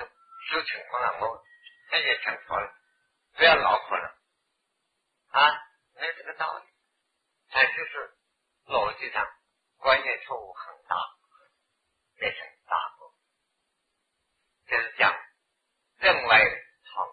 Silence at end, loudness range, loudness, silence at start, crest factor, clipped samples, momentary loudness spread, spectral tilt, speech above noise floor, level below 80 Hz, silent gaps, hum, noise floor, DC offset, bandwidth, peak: 0 s; 10 LU; -25 LUFS; 0 s; 24 dB; under 0.1%; 20 LU; -4.5 dB/octave; 53 dB; -64 dBFS; none; none; -78 dBFS; under 0.1%; 5 kHz; -6 dBFS